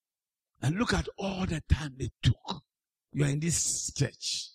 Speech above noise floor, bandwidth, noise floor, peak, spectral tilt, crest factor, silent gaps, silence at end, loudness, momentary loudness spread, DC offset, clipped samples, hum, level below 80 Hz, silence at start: over 60 dB; 15 kHz; under -90 dBFS; -12 dBFS; -4 dB/octave; 20 dB; none; 0.05 s; -31 LUFS; 9 LU; under 0.1%; under 0.1%; none; -42 dBFS; 0.6 s